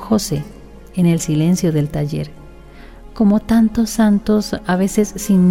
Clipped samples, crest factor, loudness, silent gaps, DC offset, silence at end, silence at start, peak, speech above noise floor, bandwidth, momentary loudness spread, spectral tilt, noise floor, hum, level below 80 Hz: under 0.1%; 14 dB; -17 LUFS; none; under 0.1%; 0 s; 0 s; -2 dBFS; 23 dB; 16.5 kHz; 10 LU; -6.5 dB/octave; -38 dBFS; none; -38 dBFS